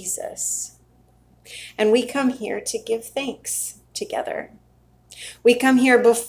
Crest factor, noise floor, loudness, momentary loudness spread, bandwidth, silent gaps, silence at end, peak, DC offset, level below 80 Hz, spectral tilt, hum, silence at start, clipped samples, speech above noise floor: 20 dB; -56 dBFS; -21 LUFS; 20 LU; 16 kHz; none; 0 s; -2 dBFS; under 0.1%; -60 dBFS; -2.5 dB/octave; none; 0 s; under 0.1%; 35 dB